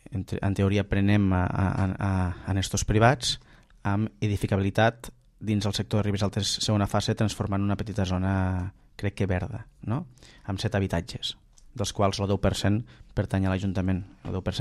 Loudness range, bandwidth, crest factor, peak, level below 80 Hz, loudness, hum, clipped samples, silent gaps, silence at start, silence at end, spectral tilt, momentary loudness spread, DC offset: 5 LU; 12.5 kHz; 20 dB; -6 dBFS; -44 dBFS; -27 LUFS; none; under 0.1%; none; 0.1 s; 0 s; -5.5 dB/octave; 11 LU; under 0.1%